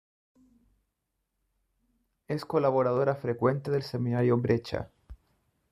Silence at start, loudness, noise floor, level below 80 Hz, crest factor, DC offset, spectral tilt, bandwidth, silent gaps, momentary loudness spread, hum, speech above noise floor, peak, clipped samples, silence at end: 2.3 s; -28 LUFS; -81 dBFS; -60 dBFS; 20 dB; under 0.1%; -8.5 dB/octave; 12.5 kHz; none; 11 LU; none; 54 dB; -10 dBFS; under 0.1%; 0.55 s